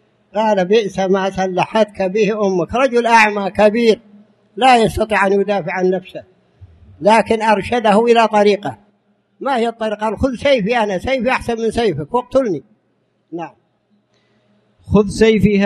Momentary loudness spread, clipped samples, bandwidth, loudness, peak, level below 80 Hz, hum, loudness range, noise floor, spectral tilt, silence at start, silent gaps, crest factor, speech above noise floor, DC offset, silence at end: 11 LU; under 0.1%; 12.5 kHz; -15 LUFS; 0 dBFS; -42 dBFS; none; 6 LU; -63 dBFS; -5.5 dB/octave; 0.35 s; none; 16 dB; 48 dB; under 0.1%; 0 s